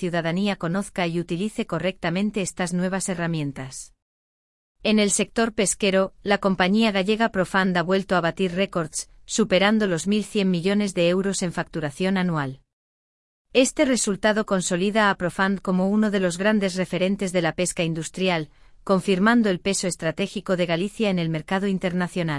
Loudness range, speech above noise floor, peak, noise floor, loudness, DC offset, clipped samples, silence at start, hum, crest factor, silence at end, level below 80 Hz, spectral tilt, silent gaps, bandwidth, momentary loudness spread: 4 LU; over 67 dB; -4 dBFS; under -90 dBFS; -23 LUFS; under 0.1%; under 0.1%; 0 s; none; 18 dB; 0 s; -52 dBFS; -4.5 dB/octave; 4.02-4.75 s, 12.73-13.45 s; 12 kHz; 7 LU